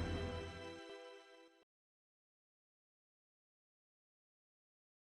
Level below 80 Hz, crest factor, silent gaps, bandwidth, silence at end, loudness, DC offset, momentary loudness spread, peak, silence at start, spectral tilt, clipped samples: -60 dBFS; 20 dB; none; 11.5 kHz; 3.5 s; -48 LUFS; under 0.1%; 20 LU; -32 dBFS; 0 s; -6 dB/octave; under 0.1%